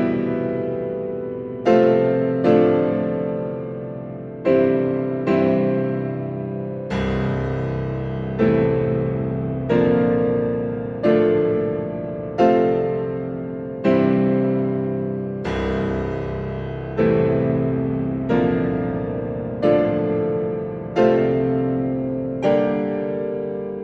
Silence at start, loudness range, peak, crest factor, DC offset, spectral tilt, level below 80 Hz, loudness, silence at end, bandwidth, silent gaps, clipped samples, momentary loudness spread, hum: 0 s; 3 LU; -4 dBFS; 16 dB; under 0.1%; -9.5 dB/octave; -42 dBFS; -21 LUFS; 0 s; 7 kHz; none; under 0.1%; 10 LU; none